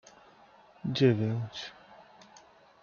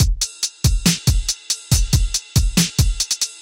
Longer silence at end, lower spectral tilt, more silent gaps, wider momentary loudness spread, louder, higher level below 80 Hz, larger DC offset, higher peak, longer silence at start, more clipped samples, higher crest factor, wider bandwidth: first, 0.8 s vs 0 s; first, -7 dB/octave vs -3 dB/octave; neither; first, 16 LU vs 4 LU; second, -30 LUFS vs -19 LUFS; second, -70 dBFS vs -22 dBFS; neither; second, -12 dBFS vs -4 dBFS; first, 0.85 s vs 0 s; neither; first, 22 dB vs 14 dB; second, 7 kHz vs 17 kHz